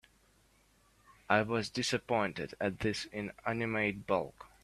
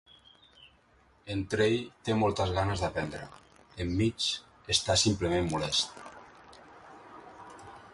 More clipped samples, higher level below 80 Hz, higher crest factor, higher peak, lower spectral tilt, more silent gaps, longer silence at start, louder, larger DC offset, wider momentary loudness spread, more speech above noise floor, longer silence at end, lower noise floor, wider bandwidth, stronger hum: neither; second, -64 dBFS vs -50 dBFS; about the same, 26 dB vs 22 dB; about the same, -10 dBFS vs -10 dBFS; about the same, -4.5 dB/octave vs -4 dB/octave; neither; first, 1.3 s vs 0.6 s; second, -34 LUFS vs -30 LUFS; neither; second, 7 LU vs 24 LU; about the same, 34 dB vs 34 dB; first, 0.15 s vs 0 s; first, -68 dBFS vs -64 dBFS; first, 14 kHz vs 11.5 kHz; neither